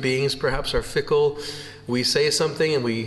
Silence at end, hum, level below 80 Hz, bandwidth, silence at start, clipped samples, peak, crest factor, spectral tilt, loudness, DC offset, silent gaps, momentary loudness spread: 0 s; none; -42 dBFS; 12.5 kHz; 0 s; under 0.1%; -10 dBFS; 14 dB; -4 dB/octave; -22 LUFS; under 0.1%; none; 10 LU